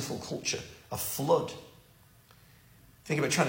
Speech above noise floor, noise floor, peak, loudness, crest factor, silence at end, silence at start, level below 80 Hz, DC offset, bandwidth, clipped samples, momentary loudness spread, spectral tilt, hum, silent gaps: 29 dB; -59 dBFS; -10 dBFS; -32 LUFS; 24 dB; 0 s; 0 s; -64 dBFS; under 0.1%; 16.5 kHz; under 0.1%; 13 LU; -4 dB/octave; none; none